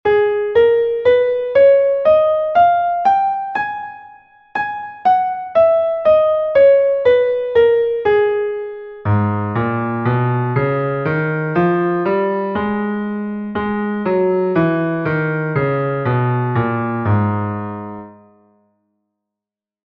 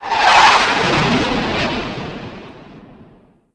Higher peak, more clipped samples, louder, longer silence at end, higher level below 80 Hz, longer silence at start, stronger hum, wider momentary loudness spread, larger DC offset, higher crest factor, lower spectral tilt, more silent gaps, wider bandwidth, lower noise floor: about the same, -2 dBFS vs 0 dBFS; neither; second, -16 LUFS vs -13 LUFS; first, 1.7 s vs 0.75 s; second, -50 dBFS vs -40 dBFS; about the same, 0.05 s vs 0 s; neither; second, 10 LU vs 21 LU; neither; about the same, 14 dB vs 16 dB; first, -10 dB/octave vs -3.5 dB/octave; neither; second, 5.8 kHz vs 11 kHz; first, -87 dBFS vs -49 dBFS